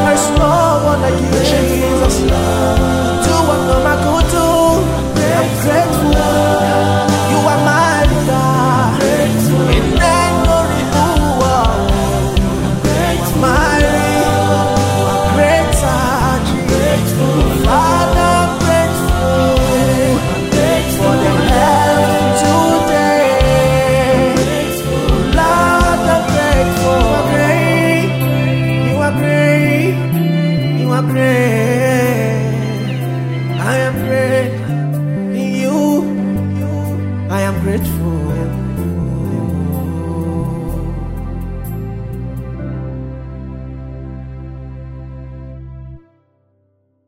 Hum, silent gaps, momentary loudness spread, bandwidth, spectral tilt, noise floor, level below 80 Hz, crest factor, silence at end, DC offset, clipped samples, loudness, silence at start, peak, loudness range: none; none; 13 LU; 16.5 kHz; -5.5 dB/octave; -60 dBFS; -24 dBFS; 14 dB; 1.1 s; under 0.1%; under 0.1%; -13 LUFS; 0 s; 0 dBFS; 10 LU